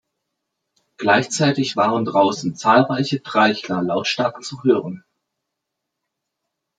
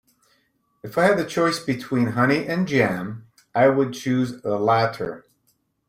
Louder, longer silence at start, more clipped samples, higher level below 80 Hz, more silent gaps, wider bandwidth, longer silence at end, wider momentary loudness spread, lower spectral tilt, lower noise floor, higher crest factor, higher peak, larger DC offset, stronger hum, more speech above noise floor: first, -19 LUFS vs -22 LUFS; first, 1 s vs 0.85 s; neither; second, -66 dBFS vs -60 dBFS; neither; second, 9.4 kHz vs 16 kHz; first, 1.8 s vs 0.7 s; second, 7 LU vs 13 LU; about the same, -5 dB/octave vs -6 dB/octave; first, -80 dBFS vs -68 dBFS; about the same, 18 dB vs 18 dB; first, -2 dBFS vs -6 dBFS; neither; neither; first, 62 dB vs 47 dB